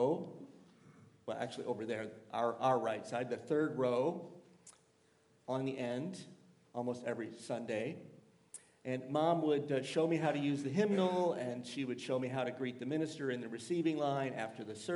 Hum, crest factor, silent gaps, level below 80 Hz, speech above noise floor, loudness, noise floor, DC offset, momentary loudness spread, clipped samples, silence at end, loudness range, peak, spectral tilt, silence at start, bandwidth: none; 18 dB; none; -86 dBFS; 34 dB; -37 LUFS; -71 dBFS; under 0.1%; 15 LU; under 0.1%; 0 s; 8 LU; -18 dBFS; -6 dB/octave; 0 s; 11.5 kHz